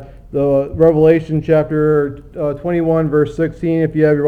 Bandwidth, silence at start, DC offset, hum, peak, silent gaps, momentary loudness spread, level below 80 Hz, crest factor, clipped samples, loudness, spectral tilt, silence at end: 6.6 kHz; 0 s; 0.1%; none; 0 dBFS; none; 9 LU; -38 dBFS; 14 dB; under 0.1%; -15 LUFS; -9.5 dB/octave; 0 s